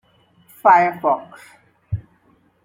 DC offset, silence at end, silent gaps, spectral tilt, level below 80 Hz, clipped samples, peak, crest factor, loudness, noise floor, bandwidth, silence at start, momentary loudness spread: under 0.1%; 0.65 s; none; -7.5 dB/octave; -52 dBFS; under 0.1%; -2 dBFS; 20 dB; -17 LUFS; -58 dBFS; 16.5 kHz; 0.65 s; 17 LU